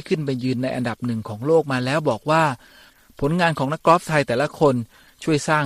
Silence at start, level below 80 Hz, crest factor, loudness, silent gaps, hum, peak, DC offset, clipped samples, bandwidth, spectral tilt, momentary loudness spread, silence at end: 0.05 s; -52 dBFS; 18 dB; -21 LUFS; none; none; -2 dBFS; under 0.1%; under 0.1%; 15.5 kHz; -6 dB/octave; 9 LU; 0 s